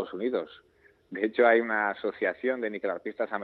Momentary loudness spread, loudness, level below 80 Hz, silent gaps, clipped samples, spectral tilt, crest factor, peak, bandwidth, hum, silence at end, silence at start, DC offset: 11 LU; -28 LUFS; -76 dBFS; none; under 0.1%; -7.5 dB/octave; 20 dB; -8 dBFS; 4.7 kHz; none; 0 s; 0 s; under 0.1%